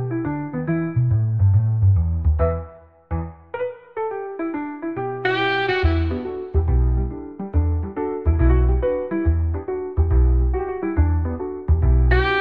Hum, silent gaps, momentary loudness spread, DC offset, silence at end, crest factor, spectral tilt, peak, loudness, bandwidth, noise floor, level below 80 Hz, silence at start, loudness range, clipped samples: none; none; 11 LU; 0.4%; 0 s; 16 dB; -9.5 dB/octave; -4 dBFS; -21 LUFS; 5 kHz; -41 dBFS; -24 dBFS; 0 s; 4 LU; under 0.1%